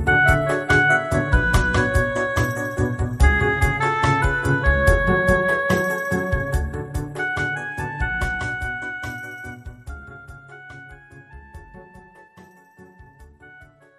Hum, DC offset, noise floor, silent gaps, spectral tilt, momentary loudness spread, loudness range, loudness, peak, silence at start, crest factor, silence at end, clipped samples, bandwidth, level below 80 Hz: none; under 0.1%; -49 dBFS; none; -6 dB/octave; 21 LU; 17 LU; -20 LUFS; -2 dBFS; 0 s; 20 dB; 0.35 s; under 0.1%; 13.5 kHz; -28 dBFS